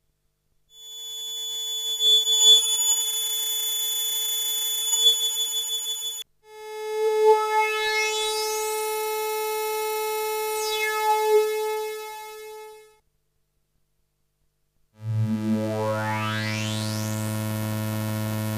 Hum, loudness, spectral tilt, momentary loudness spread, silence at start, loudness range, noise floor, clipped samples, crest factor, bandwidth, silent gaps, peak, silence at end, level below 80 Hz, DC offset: 50 Hz at -75 dBFS; -22 LUFS; -2 dB/octave; 16 LU; 0.75 s; 12 LU; -71 dBFS; under 0.1%; 18 dB; 15.5 kHz; none; -6 dBFS; 0 s; -64 dBFS; under 0.1%